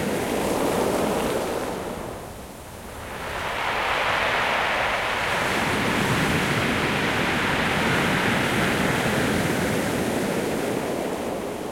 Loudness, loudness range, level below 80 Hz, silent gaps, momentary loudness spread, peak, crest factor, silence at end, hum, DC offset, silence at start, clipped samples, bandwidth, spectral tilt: -23 LUFS; 5 LU; -44 dBFS; none; 10 LU; -10 dBFS; 14 dB; 0 s; none; under 0.1%; 0 s; under 0.1%; 16.5 kHz; -4 dB/octave